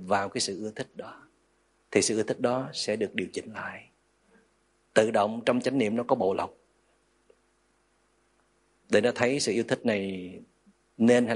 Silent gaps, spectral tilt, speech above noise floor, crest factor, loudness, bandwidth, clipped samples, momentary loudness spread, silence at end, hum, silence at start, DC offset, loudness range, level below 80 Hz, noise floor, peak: none; -4 dB/octave; 42 dB; 24 dB; -28 LUFS; 11.5 kHz; under 0.1%; 15 LU; 0 s; 50 Hz at -70 dBFS; 0 s; under 0.1%; 3 LU; -72 dBFS; -69 dBFS; -6 dBFS